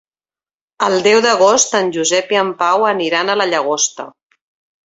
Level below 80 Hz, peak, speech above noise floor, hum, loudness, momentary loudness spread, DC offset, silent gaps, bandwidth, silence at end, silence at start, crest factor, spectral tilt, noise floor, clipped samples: -64 dBFS; -2 dBFS; over 76 dB; none; -14 LUFS; 7 LU; under 0.1%; none; 8 kHz; 0.75 s; 0.8 s; 14 dB; -2 dB/octave; under -90 dBFS; under 0.1%